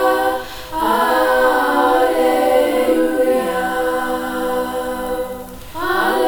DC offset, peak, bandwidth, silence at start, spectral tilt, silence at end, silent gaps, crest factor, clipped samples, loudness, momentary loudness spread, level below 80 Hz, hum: under 0.1%; -2 dBFS; over 20 kHz; 0 s; -3.5 dB/octave; 0 s; none; 14 dB; under 0.1%; -17 LUFS; 10 LU; -42 dBFS; none